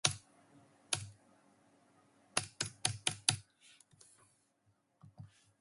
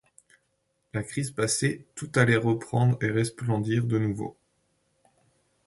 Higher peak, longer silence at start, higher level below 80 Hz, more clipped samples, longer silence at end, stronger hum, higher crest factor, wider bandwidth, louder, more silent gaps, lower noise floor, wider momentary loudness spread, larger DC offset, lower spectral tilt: about the same, -8 dBFS vs -6 dBFS; second, 0.05 s vs 0.95 s; second, -70 dBFS vs -60 dBFS; neither; second, 0.35 s vs 1.35 s; neither; first, 34 dB vs 22 dB; about the same, 12 kHz vs 11.5 kHz; second, -37 LUFS vs -27 LUFS; neither; about the same, -77 dBFS vs -74 dBFS; first, 24 LU vs 13 LU; neither; second, -1 dB/octave vs -5.5 dB/octave